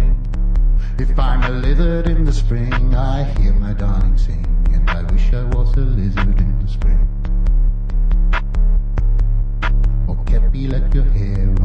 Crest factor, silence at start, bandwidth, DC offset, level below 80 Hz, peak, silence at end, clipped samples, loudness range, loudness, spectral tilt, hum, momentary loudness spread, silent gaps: 10 dB; 0 s; 5 kHz; under 0.1%; -14 dBFS; -4 dBFS; 0 s; under 0.1%; 1 LU; -19 LUFS; -8 dB/octave; none; 3 LU; none